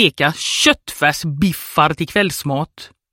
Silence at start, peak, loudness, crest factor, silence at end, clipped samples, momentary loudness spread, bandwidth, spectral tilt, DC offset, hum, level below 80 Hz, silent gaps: 0 s; 0 dBFS; -16 LUFS; 18 dB; 0.25 s; under 0.1%; 8 LU; 17 kHz; -3.5 dB/octave; under 0.1%; none; -46 dBFS; none